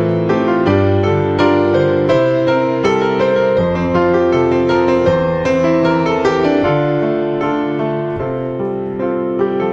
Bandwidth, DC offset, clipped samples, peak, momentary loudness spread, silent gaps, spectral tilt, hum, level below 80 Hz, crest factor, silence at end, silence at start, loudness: 7.6 kHz; under 0.1%; under 0.1%; 0 dBFS; 6 LU; none; -7.5 dB/octave; none; -38 dBFS; 14 dB; 0 s; 0 s; -15 LUFS